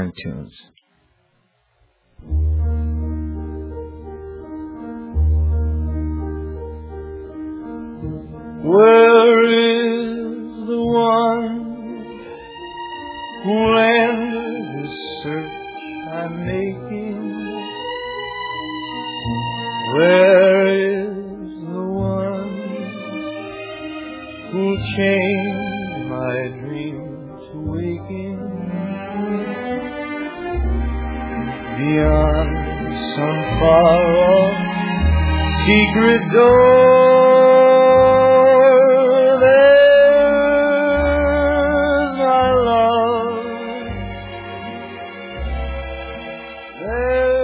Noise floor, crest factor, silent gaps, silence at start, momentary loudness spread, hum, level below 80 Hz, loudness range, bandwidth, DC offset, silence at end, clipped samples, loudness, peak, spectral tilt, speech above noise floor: -63 dBFS; 16 dB; none; 0 s; 21 LU; none; -30 dBFS; 15 LU; 4 kHz; under 0.1%; 0 s; under 0.1%; -16 LUFS; 0 dBFS; -10.5 dB/octave; 50 dB